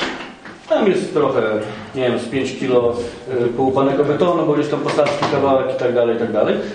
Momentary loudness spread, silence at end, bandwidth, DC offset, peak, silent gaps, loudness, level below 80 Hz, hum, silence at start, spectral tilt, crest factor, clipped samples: 8 LU; 0 s; 10 kHz; under 0.1%; -2 dBFS; none; -18 LUFS; -50 dBFS; none; 0 s; -6 dB/octave; 16 dB; under 0.1%